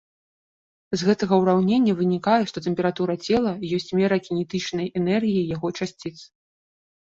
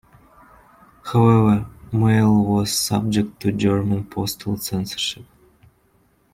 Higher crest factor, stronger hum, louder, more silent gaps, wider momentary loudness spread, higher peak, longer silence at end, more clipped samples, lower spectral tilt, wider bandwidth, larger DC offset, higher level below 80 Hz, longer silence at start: about the same, 18 dB vs 16 dB; neither; second, -23 LUFS vs -20 LUFS; neither; about the same, 9 LU vs 10 LU; about the same, -6 dBFS vs -4 dBFS; second, 0.8 s vs 1.1 s; neither; about the same, -6.5 dB/octave vs -6 dB/octave; second, 7.8 kHz vs 16.5 kHz; neither; second, -58 dBFS vs -48 dBFS; second, 0.9 s vs 1.05 s